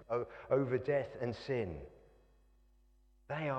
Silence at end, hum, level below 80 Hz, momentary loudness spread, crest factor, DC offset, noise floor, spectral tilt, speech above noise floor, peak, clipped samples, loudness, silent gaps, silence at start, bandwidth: 0 s; none; -62 dBFS; 11 LU; 20 dB; under 0.1%; -68 dBFS; -8 dB/octave; 31 dB; -18 dBFS; under 0.1%; -37 LUFS; none; 0 s; 8.4 kHz